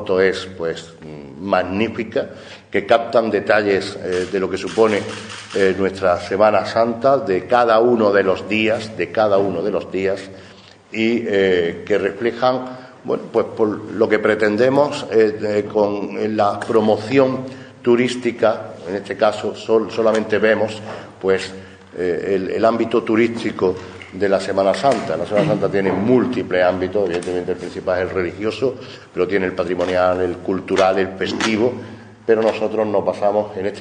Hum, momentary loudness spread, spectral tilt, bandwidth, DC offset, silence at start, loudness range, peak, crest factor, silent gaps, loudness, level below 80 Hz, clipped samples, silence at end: none; 10 LU; -6 dB/octave; 10 kHz; under 0.1%; 0 s; 4 LU; 0 dBFS; 18 dB; none; -18 LUFS; -56 dBFS; under 0.1%; 0 s